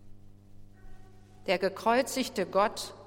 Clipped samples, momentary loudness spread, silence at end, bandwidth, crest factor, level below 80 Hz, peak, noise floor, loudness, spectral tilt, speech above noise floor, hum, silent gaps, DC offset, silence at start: under 0.1%; 5 LU; 0 s; 16.5 kHz; 20 dB; -56 dBFS; -12 dBFS; -50 dBFS; -29 LUFS; -3.5 dB/octave; 21 dB; 50 Hz at -55 dBFS; none; under 0.1%; 0 s